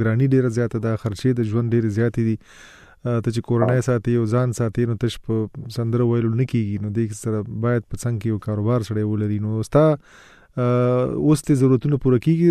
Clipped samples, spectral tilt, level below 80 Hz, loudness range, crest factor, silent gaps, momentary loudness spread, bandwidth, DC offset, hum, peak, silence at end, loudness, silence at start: under 0.1%; -8 dB/octave; -46 dBFS; 3 LU; 16 dB; none; 8 LU; 13 kHz; under 0.1%; none; -4 dBFS; 0 s; -21 LUFS; 0 s